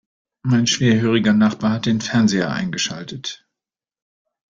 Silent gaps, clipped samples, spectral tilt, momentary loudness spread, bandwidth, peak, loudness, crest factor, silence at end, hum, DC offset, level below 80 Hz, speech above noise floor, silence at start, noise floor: none; under 0.1%; -5 dB/octave; 13 LU; 7.6 kHz; -4 dBFS; -18 LUFS; 16 dB; 1.15 s; none; under 0.1%; -54 dBFS; 70 dB; 0.45 s; -88 dBFS